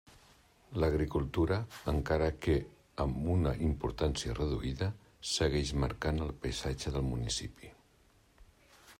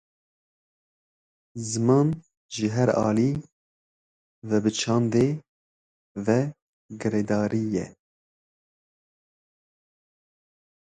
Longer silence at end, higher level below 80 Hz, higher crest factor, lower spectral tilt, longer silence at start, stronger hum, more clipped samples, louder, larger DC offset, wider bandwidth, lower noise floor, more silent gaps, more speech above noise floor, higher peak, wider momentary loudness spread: second, 0.05 s vs 3.05 s; first, -44 dBFS vs -60 dBFS; about the same, 16 dB vs 20 dB; about the same, -5.5 dB/octave vs -6 dB/octave; second, 0.7 s vs 1.55 s; neither; neither; second, -34 LUFS vs -25 LUFS; neither; first, 15.5 kHz vs 9.6 kHz; second, -66 dBFS vs under -90 dBFS; second, none vs 2.37-2.49 s, 3.52-4.42 s, 5.49-6.15 s, 6.62-6.89 s; second, 33 dB vs over 67 dB; second, -18 dBFS vs -8 dBFS; second, 6 LU vs 15 LU